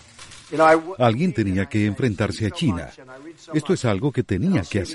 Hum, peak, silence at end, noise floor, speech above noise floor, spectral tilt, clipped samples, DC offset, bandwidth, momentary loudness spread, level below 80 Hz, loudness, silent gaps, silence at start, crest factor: none; -4 dBFS; 0 s; -44 dBFS; 22 dB; -6.5 dB/octave; under 0.1%; under 0.1%; 11.5 kHz; 23 LU; -48 dBFS; -21 LUFS; none; 0.2 s; 18 dB